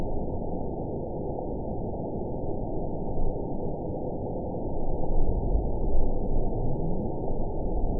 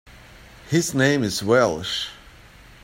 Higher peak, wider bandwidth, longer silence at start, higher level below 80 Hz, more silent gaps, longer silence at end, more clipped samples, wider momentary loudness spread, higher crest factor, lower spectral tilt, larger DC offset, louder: second, -10 dBFS vs -4 dBFS; second, 1 kHz vs 16.5 kHz; about the same, 0 s vs 0.05 s; first, -30 dBFS vs -52 dBFS; neither; second, 0 s vs 0.65 s; neither; second, 3 LU vs 8 LU; about the same, 16 dB vs 18 dB; first, -17.5 dB/octave vs -4.5 dB/octave; first, 1% vs under 0.1%; second, -32 LUFS vs -21 LUFS